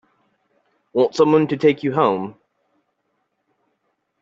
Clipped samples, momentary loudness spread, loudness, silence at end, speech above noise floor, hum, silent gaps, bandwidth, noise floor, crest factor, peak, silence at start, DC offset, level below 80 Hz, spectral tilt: under 0.1%; 11 LU; -18 LUFS; 1.9 s; 54 dB; none; none; 7.8 kHz; -71 dBFS; 20 dB; -2 dBFS; 0.95 s; under 0.1%; -66 dBFS; -5.5 dB/octave